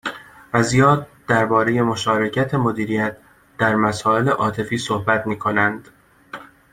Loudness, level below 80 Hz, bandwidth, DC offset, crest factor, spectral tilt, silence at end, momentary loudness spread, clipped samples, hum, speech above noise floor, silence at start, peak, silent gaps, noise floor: -19 LUFS; -52 dBFS; 16 kHz; under 0.1%; 18 dB; -5.5 dB/octave; 0.25 s; 15 LU; under 0.1%; none; 21 dB; 0.05 s; -2 dBFS; none; -39 dBFS